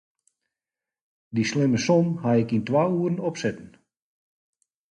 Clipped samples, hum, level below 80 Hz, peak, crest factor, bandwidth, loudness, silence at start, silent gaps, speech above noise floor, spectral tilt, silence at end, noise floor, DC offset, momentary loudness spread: under 0.1%; none; -62 dBFS; -8 dBFS; 18 dB; 9.6 kHz; -24 LUFS; 1.3 s; none; over 67 dB; -6.5 dB/octave; 1.25 s; under -90 dBFS; under 0.1%; 9 LU